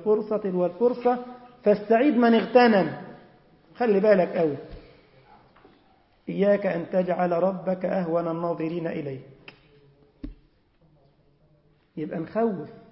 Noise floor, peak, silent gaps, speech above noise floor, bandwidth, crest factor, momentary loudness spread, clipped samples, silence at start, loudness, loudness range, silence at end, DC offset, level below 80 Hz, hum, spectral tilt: -62 dBFS; -6 dBFS; none; 39 dB; 5.8 kHz; 20 dB; 21 LU; under 0.1%; 0 s; -24 LUFS; 13 LU; 0.15 s; under 0.1%; -58 dBFS; none; -11 dB/octave